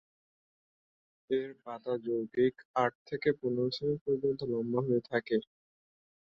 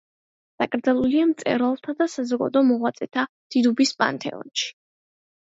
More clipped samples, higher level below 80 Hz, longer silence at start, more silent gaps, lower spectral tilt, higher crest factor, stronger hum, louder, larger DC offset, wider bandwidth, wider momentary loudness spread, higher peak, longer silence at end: neither; second, -72 dBFS vs -64 dBFS; first, 1.3 s vs 0.6 s; about the same, 2.65-2.74 s, 2.95-3.05 s, 4.01-4.06 s vs 3.29-3.50 s; first, -8 dB/octave vs -4 dB/octave; about the same, 18 dB vs 18 dB; neither; second, -33 LUFS vs -23 LUFS; neither; second, 7 kHz vs 7.8 kHz; second, 4 LU vs 8 LU; second, -16 dBFS vs -4 dBFS; about the same, 0.9 s vs 0.8 s